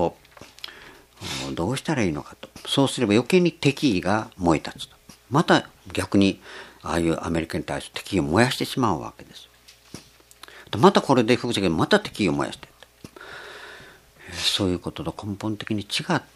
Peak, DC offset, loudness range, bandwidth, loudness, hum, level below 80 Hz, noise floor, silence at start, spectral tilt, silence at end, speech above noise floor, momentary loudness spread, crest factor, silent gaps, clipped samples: 0 dBFS; under 0.1%; 5 LU; 15 kHz; -23 LUFS; none; -50 dBFS; -49 dBFS; 0 s; -5 dB/octave; 0.15 s; 26 dB; 20 LU; 24 dB; none; under 0.1%